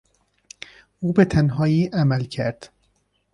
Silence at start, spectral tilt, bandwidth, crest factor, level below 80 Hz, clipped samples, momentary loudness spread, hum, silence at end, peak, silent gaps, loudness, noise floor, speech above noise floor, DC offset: 1 s; -8 dB/octave; 10.5 kHz; 20 dB; -46 dBFS; under 0.1%; 22 LU; 50 Hz at -45 dBFS; 0.65 s; -2 dBFS; none; -21 LUFS; -67 dBFS; 47 dB; under 0.1%